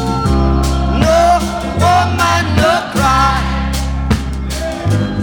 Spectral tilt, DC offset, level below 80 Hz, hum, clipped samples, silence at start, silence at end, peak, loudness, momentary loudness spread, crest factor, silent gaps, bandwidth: -5.5 dB/octave; under 0.1%; -20 dBFS; none; under 0.1%; 0 s; 0 s; -2 dBFS; -14 LUFS; 7 LU; 10 dB; none; 19 kHz